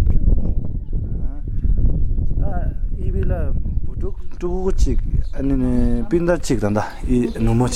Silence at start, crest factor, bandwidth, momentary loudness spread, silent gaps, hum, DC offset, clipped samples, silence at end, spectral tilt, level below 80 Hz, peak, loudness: 0 s; 14 dB; 9.8 kHz; 9 LU; none; none; under 0.1%; under 0.1%; 0 s; -7.5 dB/octave; -20 dBFS; -4 dBFS; -22 LUFS